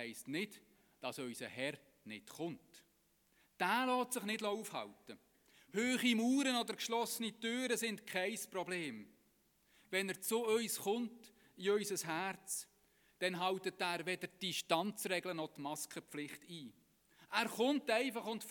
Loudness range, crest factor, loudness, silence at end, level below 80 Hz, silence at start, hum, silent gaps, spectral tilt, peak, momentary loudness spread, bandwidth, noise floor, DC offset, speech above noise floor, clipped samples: 4 LU; 24 dB; -39 LUFS; 0 s; -86 dBFS; 0 s; none; none; -3 dB/octave; -18 dBFS; 13 LU; 19 kHz; -76 dBFS; under 0.1%; 36 dB; under 0.1%